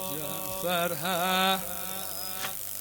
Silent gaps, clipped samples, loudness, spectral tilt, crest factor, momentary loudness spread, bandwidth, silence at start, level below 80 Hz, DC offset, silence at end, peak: none; under 0.1%; -29 LUFS; -2.5 dB/octave; 20 dB; 8 LU; 18 kHz; 0 s; -60 dBFS; under 0.1%; 0 s; -10 dBFS